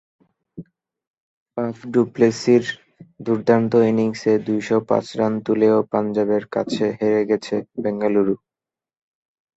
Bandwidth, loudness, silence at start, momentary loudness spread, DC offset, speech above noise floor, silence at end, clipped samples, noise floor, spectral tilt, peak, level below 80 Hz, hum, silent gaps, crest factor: 8 kHz; -20 LUFS; 0.55 s; 10 LU; under 0.1%; over 71 dB; 1.2 s; under 0.1%; under -90 dBFS; -6.5 dB/octave; -2 dBFS; -62 dBFS; none; 1.07-1.14 s, 1.20-1.46 s; 18 dB